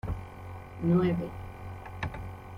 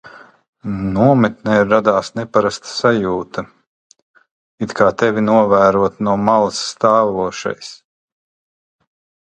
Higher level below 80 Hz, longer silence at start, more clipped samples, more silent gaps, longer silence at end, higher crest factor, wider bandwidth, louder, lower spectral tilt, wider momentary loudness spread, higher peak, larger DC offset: about the same, -46 dBFS vs -48 dBFS; about the same, 0.05 s vs 0.05 s; neither; second, none vs 0.48-0.53 s, 3.67-3.90 s, 4.02-4.14 s, 4.31-4.58 s; second, 0 s vs 1.5 s; about the same, 18 dB vs 16 dB; second, 6.4 kHz vs 9.4 kHz; second, -31 LUFS vs -15 LUFS; first, -9 dB/octave vs -6 dB/octave; first, 18 LU vs 14 LU; second, -14 dBFS vs 0 dBFS; neither